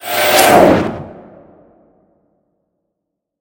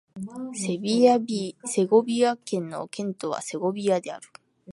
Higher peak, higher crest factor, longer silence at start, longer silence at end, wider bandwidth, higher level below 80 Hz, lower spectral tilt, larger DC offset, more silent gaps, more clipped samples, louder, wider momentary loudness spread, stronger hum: first, 0 dBFS vs -6 dBFS; about the same, 16 dB vs 20 dB; about the same, 0.05 s vs 0.15 s; first, 2.3 s vs 0.05 s; first, 17.5 kHz vs 11.5 kHz; first, -44 dBFS vs -74 dBFS; second, -3.5 dB/octave vs -5 dB/octave; neither; neither; first, 0.2% vs under 0.1%; first, -10 LUFS vs -25 LUFS; first, 22 LU vs 14 LU; neither